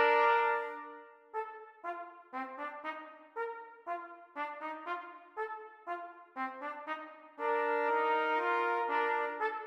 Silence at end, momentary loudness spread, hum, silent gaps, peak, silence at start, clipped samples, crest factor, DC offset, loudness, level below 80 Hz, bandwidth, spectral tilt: 0 s; 16 LU; none; none; -16 dBFS; 0 s; under 0.1%; 18 dB; under 0.1%; -35 LUFS; under -90 dBFS; 6.8 kHz; -2.5 dB/octave